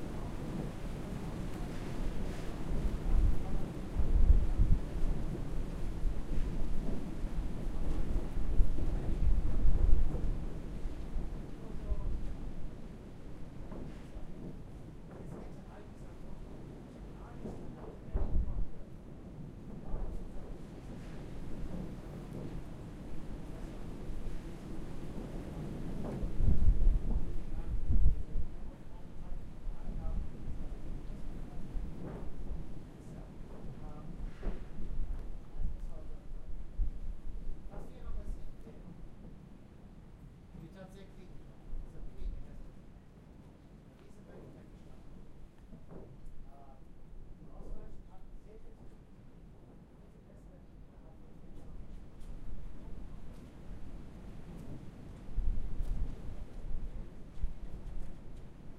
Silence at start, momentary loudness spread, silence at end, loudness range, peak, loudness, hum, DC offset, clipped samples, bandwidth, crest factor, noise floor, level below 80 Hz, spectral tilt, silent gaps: 0 s; 20 LU; 0 s; 19 LU; -10 dBFS; -42 LUFS; none; under 0.1%; under 0.1%; 4.8 kHz; 22 dB; -55 dBFS; -36 dBFS; -8 dB/octave; none